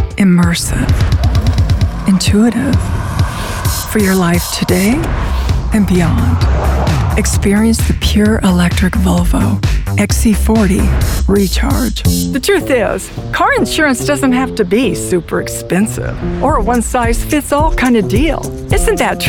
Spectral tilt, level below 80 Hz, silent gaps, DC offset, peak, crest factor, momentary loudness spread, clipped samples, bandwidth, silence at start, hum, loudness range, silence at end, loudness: -5.5 dB/octave; -18 dBFS; none; under 0.1%; 0 dBFS; 12 dB; 5 LU; under 0.1%; 18 kHz; 0 s; none; 2 LU; 0 s; -13 LUFS